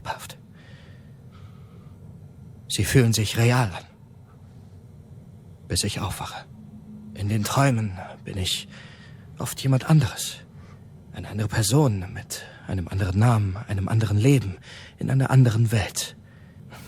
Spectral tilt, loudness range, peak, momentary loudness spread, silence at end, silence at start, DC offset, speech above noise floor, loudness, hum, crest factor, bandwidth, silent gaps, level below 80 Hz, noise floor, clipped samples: -5.5 dB/octave; 5 LU; -4 dBFS; 25 LU; 0 s; 0.05 s; under 0.1%; 25 dB; -24 LUFS; none; 20 dB; 17.5 kHz; none; -50 dBFS; -48 dBFS; under 0.1%